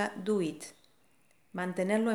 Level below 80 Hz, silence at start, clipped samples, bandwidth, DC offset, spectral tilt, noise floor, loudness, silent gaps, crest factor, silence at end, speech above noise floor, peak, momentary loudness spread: -82 dBFS; 0 s; under 0.1%; 15 kHz; under 0.1%; -5.5 dB/octave; -70 dBFS; -33 LUFS; none; 18 dB; 0 s; 38 dB; -16 dBFS; 16 LU